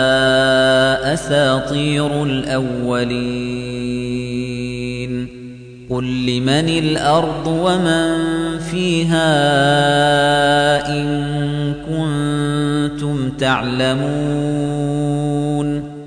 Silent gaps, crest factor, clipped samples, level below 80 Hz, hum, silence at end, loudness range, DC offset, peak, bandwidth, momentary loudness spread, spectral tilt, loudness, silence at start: none; 14 dB; under 0.1%; -40 dBFS; none; 0 s; 6 LU; under 0.1%; -2 dBFS; 10.5 kHz; 10 LU; -5.5 dB/octave; -17 LUFS; 0 s